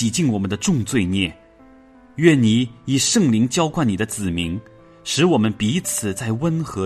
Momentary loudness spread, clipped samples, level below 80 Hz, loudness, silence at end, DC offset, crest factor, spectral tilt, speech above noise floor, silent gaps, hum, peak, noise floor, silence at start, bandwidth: 8 LU; under 0.1%; -50 dBFS; -19 LUFS; 0 s; under 0.1%; 18 dB; -4.5 dB/octave; 29 dB; none; none; -2 dBFS; -48 dBFS; 0 s; 13.5 kHz